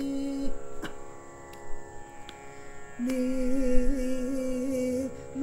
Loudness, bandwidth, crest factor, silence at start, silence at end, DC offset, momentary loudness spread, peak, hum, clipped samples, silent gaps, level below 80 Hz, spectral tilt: -31 LUFS; 12.5 kHz; 20 dB; 0 s; 0 s; under 0.1%; 17 LU; -8 dBFS; none; under 0.1%; none; -36 dBFS; -6 dB/octave